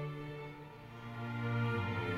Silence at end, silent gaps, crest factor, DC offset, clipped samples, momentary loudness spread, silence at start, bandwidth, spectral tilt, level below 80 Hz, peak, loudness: 0 s; none; 14 dB; under 0.1%; under 0.1%; 15 LU; 0 s; 7.4 kHz; -8 dB/octave; -64 dBFS; -24 dBFS; -40 LUFS